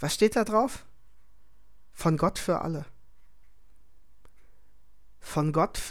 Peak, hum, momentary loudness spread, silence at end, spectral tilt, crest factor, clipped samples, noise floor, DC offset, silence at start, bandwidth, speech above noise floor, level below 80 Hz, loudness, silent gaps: -8 dBFS; none; 16 LU; 0 s; -5.5 dB/octave; 22 dB; under 0.1%; -62 dBFS; 0.6%; 0 s; 17 kHz; 36 dB; -50 dBFS; -27 LUFS; none